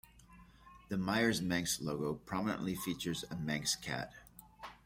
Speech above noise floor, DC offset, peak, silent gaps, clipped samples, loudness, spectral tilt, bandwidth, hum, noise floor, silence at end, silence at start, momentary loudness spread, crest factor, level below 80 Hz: 23 dB; under 0.1%; -18 dBFS; none; under 0.1%; -37 LUFS; -4 dB/octave; 16.5 kHz; none; -60 dBFS; 0.1 s; 0.15 s; 17 LU; 20 dB; -62 dBFS